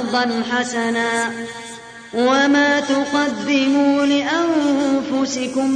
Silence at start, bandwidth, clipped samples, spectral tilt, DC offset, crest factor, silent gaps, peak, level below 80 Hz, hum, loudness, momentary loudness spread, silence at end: 0 s; 10.5 kHz; under 0.1%; -3 dB/octave; under 0.1%; 14 dB; none; -4 dBFS; -58 dBFS; none; -18 LUFS; 12 LU; 0 s